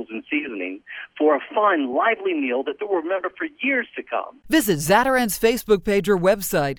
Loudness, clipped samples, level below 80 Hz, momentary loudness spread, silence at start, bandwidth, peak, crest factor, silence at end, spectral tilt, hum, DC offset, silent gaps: -21 LUFS; under 0.1%; -48 dBFS; 11 LU; 0 s; over 20 kHz; -4 dBFS; 18 dB; 0 s; -4.5 dB/octave; none; under 0.1%; none